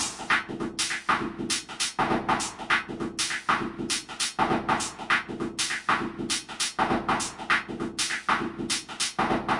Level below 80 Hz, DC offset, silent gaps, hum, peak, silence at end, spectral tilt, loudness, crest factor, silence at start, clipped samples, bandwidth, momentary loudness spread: -54 dBFS; under 0.1%; none; none; -10 dBFS; 0 s; -2 dB/octave; -27 LUFS; 20 dB; 0 s; under 0.1%; 11.5 kHz; 4 LU